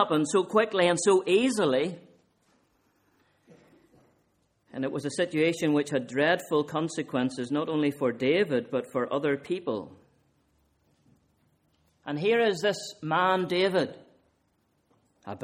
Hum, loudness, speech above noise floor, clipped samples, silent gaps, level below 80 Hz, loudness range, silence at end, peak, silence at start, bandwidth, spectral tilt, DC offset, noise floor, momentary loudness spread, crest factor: none; -27 LUFS; 45 dB; under 0.1%; none; -72 dBFS; 8 LU; 0 s; -10 dBFS; 0 s; 16 kHz; -4.5 dB/octave; under 0.1%; -71 dBFS; 11 LU; 20 dB